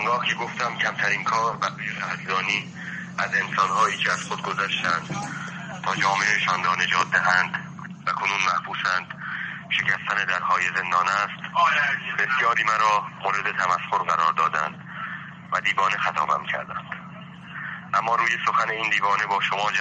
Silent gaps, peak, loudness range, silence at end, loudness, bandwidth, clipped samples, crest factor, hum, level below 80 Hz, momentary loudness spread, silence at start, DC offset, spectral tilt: none; -6 dBFS; 3 LU; 0 s; -23 LUFS; 9.6 kHz; under 0.1%; 18 dB; none; -68 dBFS; 12 LU; 0 s; under 0.1%; -2.5 dB/octave